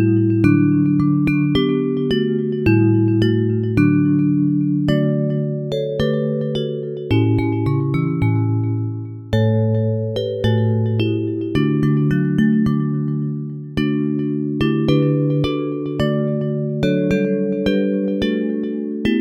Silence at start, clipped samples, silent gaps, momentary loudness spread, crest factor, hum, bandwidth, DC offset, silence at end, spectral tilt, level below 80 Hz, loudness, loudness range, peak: 0 s; under 0.1%; none; 7 LU; 16 dB; none; 7.4 kHz; under 0.1%; 0 s; -9 dB/octave; -42 dBFS; -18 LUFS; 3 LU; 0 dBFS